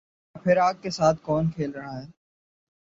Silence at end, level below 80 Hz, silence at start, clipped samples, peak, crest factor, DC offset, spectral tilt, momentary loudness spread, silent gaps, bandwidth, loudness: 0.75 s; -56 dBFS; 0.35 s; under 0.1%; -8 dBFS; 18 dB; under 0.1%; -6.5 dB/octave; 15 LU; none; 7.8 kHz; -24 LUFS